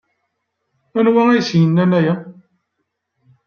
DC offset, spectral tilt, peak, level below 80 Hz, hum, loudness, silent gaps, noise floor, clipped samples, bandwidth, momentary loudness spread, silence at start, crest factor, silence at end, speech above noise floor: under 0.1%; -7.5 dB/octave; -2 dBFS; -64 dBFS; none; -15 LUFS; none; -74 dBFS; under 0.1%; 6.8 kHz; 9 LU; 0.95 s; 16 dB; 1.15 s; 60 dB